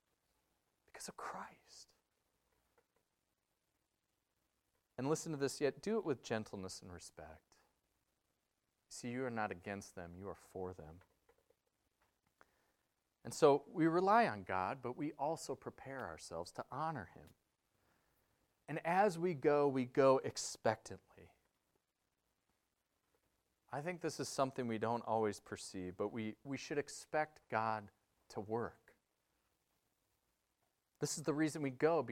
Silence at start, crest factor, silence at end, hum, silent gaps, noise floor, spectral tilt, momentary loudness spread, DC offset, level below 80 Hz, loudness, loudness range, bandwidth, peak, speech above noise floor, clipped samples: 0.95 s; 26 dB; 0 s; none; none; -87 dBFS; -5 dB/octave; 18 LU; under 0.1%; -78 dBFS; -39 LUFS; 15 LU; 16 kHz; -16 dBFS; 47 dB; under 0.1%